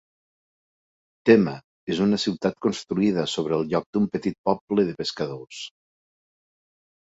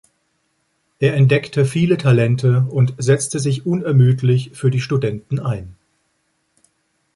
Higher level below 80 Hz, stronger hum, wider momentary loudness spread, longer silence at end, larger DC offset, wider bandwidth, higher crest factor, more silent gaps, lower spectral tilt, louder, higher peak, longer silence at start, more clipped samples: second, -60 dBFS vs -52 dBFS; neither; first, 14 LU vs 8 LU; about the same, 1.35 s vs 1.45 s; neither; second, 8 kHz vs 11.5 kHz; first, 22 dB vs 16 dB; first, 1.64-1.87 s, 3.86-3.93 s, 4.38-4.44 s, 4.61-4.67 s vs none; about the same, -6 dB/octave vs -6.5 dB/octave; second, -24 LUFS vs -17 LUFS; about the same, -4 dBFS vs -2 dBFS; first, 1.25 s vs 1 s; neither